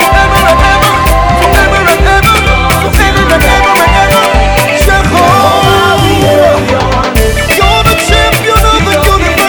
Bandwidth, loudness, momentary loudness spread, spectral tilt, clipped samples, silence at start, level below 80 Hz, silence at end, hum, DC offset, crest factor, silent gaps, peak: over 20 kHz; -6 LUFS; 2 LU; -4 dB/octave; 2%; 0 s; -14 dBFS; 0 s; none; under 0.1%; 6 dB; none; 0 dBFS